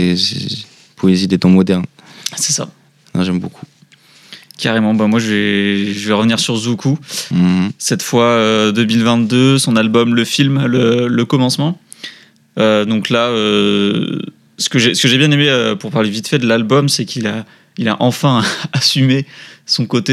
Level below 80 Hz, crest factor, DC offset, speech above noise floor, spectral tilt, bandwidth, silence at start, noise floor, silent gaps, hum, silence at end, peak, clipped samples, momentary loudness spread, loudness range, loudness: -60 dBFS; 14 dB; under 0.1%; 33 dB; -4.5 dB/octave; 14.5 kHz; 0 s; -47 dBFS; none; none; 0 s; 0 dBFS; under 0.1%; 11 LU; 4 LU; -14 LUFS